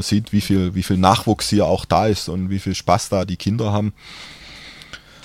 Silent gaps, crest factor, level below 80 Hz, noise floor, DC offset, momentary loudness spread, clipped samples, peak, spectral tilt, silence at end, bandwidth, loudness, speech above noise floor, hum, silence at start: none; 18 dB; -42 dBFS; -40 dBFS; under 0.1%; 20 LU; under 0.1%; 0 dBFS; -5.5 dB/octave; 0.25 s; 16 kHz; -19 LUFS; 22 dB; none; 0 s